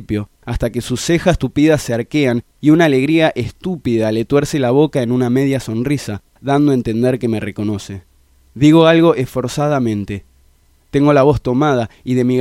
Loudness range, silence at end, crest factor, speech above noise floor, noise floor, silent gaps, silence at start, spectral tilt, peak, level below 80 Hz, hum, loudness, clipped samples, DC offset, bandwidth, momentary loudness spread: 2 LU; 0 s; 14 dB; 38 dB; -52 dBFS; none; 0 s; -6.5 dB/octave; 0 dBFS; -36 dBFS; none; -15 LUFS; under 0.1%; under 0.1%; 15.5 kHz; 12 LU